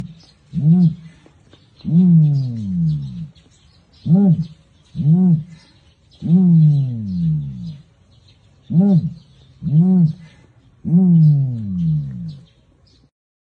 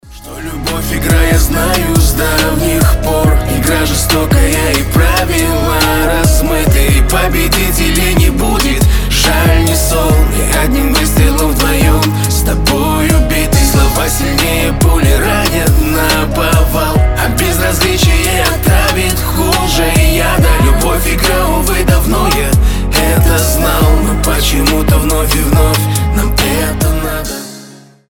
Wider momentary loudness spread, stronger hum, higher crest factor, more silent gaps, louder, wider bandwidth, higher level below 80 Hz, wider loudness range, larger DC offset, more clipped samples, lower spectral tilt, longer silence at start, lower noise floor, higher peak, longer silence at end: first, 19 LU vs 3 LU; neither; about the same, 14 dB vs 10 dB; neither; second, -16 LUFS vs -11 LUFS; second, 5 kHz vs 19.5 kHz; second, -52 dBFS vs -14 dBFS; about the same, 3 LU vs 1 LU; neither; neither; first, -11.5 dB/octave vs -4.5 dB/octave; about the same, 0 s vs 0.05 s; first, -53 dBFS vs -36 dBFS; second, -4 dBFS vs 0 dBFS; first, 1.15 s vs 0.35 s